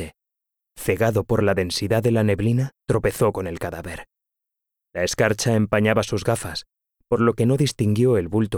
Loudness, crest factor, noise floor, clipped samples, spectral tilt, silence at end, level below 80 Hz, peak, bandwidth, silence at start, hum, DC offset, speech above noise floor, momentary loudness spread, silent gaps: -21 LUFS; 18 dB; -84 dBFS; under 0.1%; -6 dB/octave; 0 s; -46 dBFS; -4 dBFS; 17.5 kHz; 0 s; none; under 0.1%; 64 dB; 11 LU; none